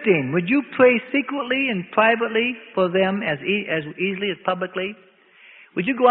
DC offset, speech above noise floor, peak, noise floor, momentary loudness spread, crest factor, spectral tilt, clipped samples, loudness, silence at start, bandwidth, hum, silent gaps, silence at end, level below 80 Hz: under 0.1%; 30 dB; -2 dBFS; -50 dBFS; 9 LU; 18 dB; -10.5 dB/octave; under 0.1%; -21 LUFS; 0 s; 4.3 kHz; none; none; 0 s; -64 dBFS